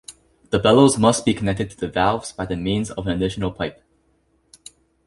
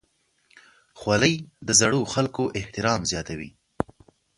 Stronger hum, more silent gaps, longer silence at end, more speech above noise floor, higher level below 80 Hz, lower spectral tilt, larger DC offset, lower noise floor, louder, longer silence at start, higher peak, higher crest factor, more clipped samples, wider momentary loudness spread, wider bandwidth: neither; neither; first, 1.35 s vs 0.55 s; about the same, 44 dB vs 45 dB; first, -44 dBFS vs -50 dBFS; first, -5 dB/octave vs -3.5 dB/octave; neither; second, -63 dBFS vs -69 dBFS; first, -20 LUFS vs -24 LUFS; second, 0.1 s vs 0.95 s; about the same, -2 dBFS vs -4 dBFS; about the same, 20 dB vs 22 dB; neither; second, 12 LU vs 15 LU; about the same, 11.5 kHz vs 11.5 kHz